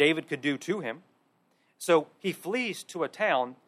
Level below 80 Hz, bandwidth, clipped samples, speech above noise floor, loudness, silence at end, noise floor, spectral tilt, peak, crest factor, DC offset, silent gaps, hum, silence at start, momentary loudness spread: -82 dBFS; 15 kHz; under 0.1%; 41 dB; -29 LUFS; 0.15 s; -69 dBFS; -4 dB/octave; -10 dBFS; 20 dB; under 0.1%; none; none; 0 s; 10 LU